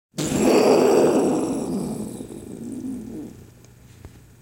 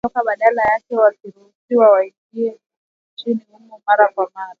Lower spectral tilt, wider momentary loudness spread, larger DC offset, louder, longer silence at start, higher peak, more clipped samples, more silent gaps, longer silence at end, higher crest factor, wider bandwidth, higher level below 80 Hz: second, -5 dB/octave vs -6.5 dB/octave; first, 20 LU vs 12 LU; neither; second, -20 LUFS vs -17 LUFS; about the same, 0.15 s vs 0.05 s; second, -4 dBFS vs 0 dBFS; neither; second, none vs 1.55-1.68 s, 2.18-2.30 s, 2.77-3.17 s; first, 0.35 s vs 0.1 s; about the same, 18 dB vs 18 dB; first, 17 kHz vs 4.9 kHz; first, -52 dBFS vs -60 dBFS